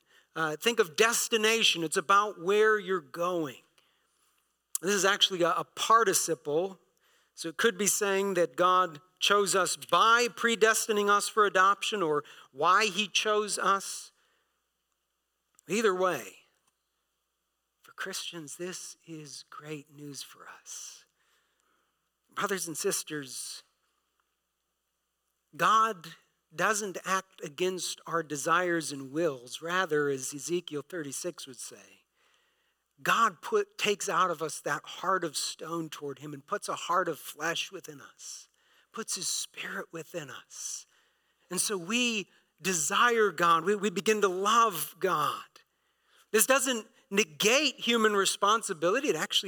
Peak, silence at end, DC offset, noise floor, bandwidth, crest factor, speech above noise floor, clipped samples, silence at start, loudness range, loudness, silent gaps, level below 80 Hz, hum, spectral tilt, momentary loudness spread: -6 dBFS; 0 s; under 0.1%; -81 dBFS; 19 kHz; 24 dB; 52 dB; under 0.1%; 0.35 s; 11 LU; -28 LUFS; none; -90 dBFS; none; -2 dB/octave; 18 LU